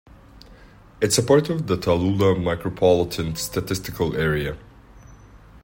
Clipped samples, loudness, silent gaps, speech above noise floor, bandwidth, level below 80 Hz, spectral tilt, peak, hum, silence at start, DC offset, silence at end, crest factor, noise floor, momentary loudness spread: under 0.1%; -22 LUFS; none; 26 dB; 16.5 kHz; -44 dBFS; -5 dB/octave; -4 dBFS; none; 0.35 s; under 0.1%; 0.05 s; 20 dB; -47 dBFS; 8 LU